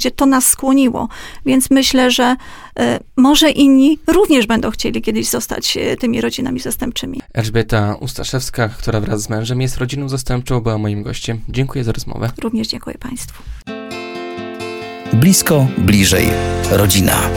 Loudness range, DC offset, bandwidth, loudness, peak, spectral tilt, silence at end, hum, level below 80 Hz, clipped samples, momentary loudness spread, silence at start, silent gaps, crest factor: 9 LU; under 0.1%; 17.5 kHz; -15 LUFS; 0 dBFS; -4.5 dB/octave; 0 s; none; -32 dBFS; under 0.1%; 15 LU; 0 s; none; 14 dB